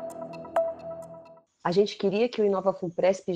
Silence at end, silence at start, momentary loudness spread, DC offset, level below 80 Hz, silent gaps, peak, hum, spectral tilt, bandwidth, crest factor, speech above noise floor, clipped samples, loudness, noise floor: 0 s; 0 s; 15 LU; under 0.1%; -70 dBFS; none; -10 dBFS; none; -6 dB/octave; 10 kHz; 18 dB; 26 dB; under 0.1%; -27 LUFS; -51 dBFS